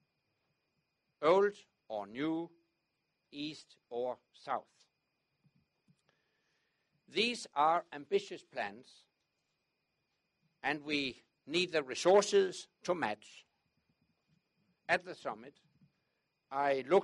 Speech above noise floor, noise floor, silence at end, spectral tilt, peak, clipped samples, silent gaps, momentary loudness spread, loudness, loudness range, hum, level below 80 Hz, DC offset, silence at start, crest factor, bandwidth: 49 dB; -84 dBFS; 0 s; -3.5 dB/octave; -14 dBFS; under 0.1%; none; 16 LU; -35 LUFS; 12 LU; none; -82 dBFS; under 0.1%; 1.2 s; 22 dB; 11.5 kHz